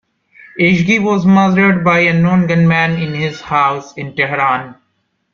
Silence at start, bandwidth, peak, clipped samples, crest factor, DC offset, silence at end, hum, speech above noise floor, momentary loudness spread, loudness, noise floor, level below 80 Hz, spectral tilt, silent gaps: 0.55 s; 7 kHz; -2 dBFS; under 0.1%; 12 dB; under 0.1%; 0.6 s; none; 52 dB; 9 LU; -13 LUFS; -65 dBFS; -50 dBFS; -7 dB/octave; none